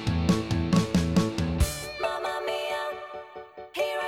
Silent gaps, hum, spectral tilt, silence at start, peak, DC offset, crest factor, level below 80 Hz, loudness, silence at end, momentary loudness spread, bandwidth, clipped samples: none; none; -5.5 dB/octave; 0 s; -10 dBFS; under 0.1%; 16 dB; -38 dBFS; -27 LUFS; 0 s; 15 LU; 16.5 kHz; under 0.1%